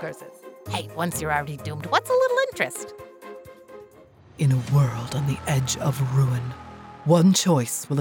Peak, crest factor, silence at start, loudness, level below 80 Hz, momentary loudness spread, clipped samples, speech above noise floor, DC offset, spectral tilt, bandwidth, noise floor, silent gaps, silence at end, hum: -6 dBFS; 18 dB; 0 s; -23 LUFS; -56 dBFS; 22 LU; under 0.1%; 28 dB; under 0.1%; -5.5 dB/octave; 19.5 kHz; -51 dBFS; none; 0 s; none